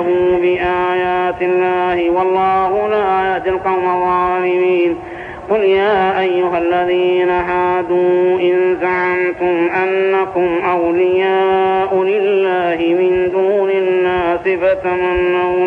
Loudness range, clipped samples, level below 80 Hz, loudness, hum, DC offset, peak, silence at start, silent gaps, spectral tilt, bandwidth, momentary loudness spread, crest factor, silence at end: 1 LU; under 0.1%; -44 dBFS; -15 LUFS; none; under 0.1%; -4 dBFS; 0 s; none; -7.5 dB/octave; 4.6 kHz; 3 LU; 10 dB; 0 s